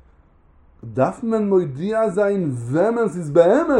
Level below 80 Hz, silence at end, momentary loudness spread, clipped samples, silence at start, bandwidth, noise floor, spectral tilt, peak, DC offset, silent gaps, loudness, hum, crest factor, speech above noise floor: -54 dBFS; 0 s; 7 LU; under 0.1%; 0.85 s; 11 kHz; -53 dBFS; -8 dB/octave; -2 dBFS; under 0.1%; none; -19 LUFS; none; 18 dB; 35 dB